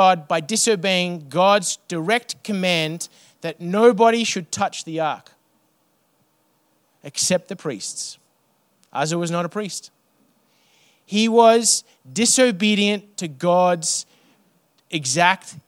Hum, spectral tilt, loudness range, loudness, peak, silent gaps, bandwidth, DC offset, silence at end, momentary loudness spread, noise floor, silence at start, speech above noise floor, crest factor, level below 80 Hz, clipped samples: none; -3 dB/octave; 10 LU; -19 LUFS; 0 dBFS; none; 16.5 kHz; under 0.1%; 0.1 s; 15 LU; -65 dBFS; 0 s; 45 dB; 20 dB; -76 dBFS; under 0.1%